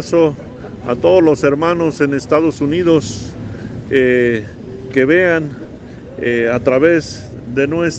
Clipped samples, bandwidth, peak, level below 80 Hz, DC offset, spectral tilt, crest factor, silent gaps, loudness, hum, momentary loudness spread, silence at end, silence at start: under 0.1%; 8.6 kHz; 0 dBFS; -42 dBFS; under 0.1%; -6.5 dB/octave; 14 dB; none; -14 LUFS; none; 18 LU; 0 s; 0 s